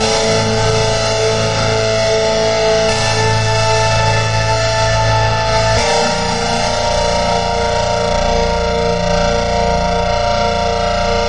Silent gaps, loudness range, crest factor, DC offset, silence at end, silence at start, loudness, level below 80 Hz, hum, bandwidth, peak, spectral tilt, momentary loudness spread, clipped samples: none; 2 LU; 12 dB; 3%; 0 s; 0 s; -14 LUFS; -26 dBFS; none; 11 kHz; -2 dBFS; -4 dB/octave; 2 LU; under 0.1%